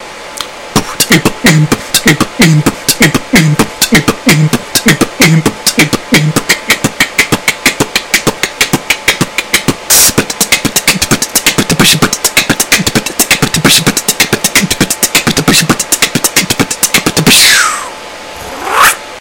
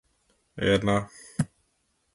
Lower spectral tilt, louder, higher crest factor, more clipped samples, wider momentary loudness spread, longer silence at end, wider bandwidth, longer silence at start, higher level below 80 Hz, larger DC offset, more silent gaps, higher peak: second, -2.5 dB/octave vs -5.5 dB/octave; first, -8 LUFS vs -27 LUFS; second, 10 dB vs 22 dB; first, 2% vs under 0.1%; second, 6 LU vs 13 LU; second, 0 s vs 0.7 s; first, over 20 kHz vs 11.5 kHz; second, 0 s vs 0.55 s; first, -34 dBFS vs -52 dBFS; first, 0.4% vs under 0.1%; neither; first, 0 dBFS vs -8 dBFS